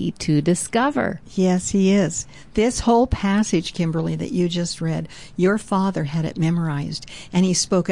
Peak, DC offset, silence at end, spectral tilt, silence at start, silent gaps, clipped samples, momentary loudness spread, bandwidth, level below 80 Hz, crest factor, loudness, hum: -8 dBFS; 0.5%; 0 s; -5.5 dB/octave; 0 s; none; under 0.1%; 8 LU; 11.5 kHz; -42 dBFS; 12 dB; -21 LUFS; none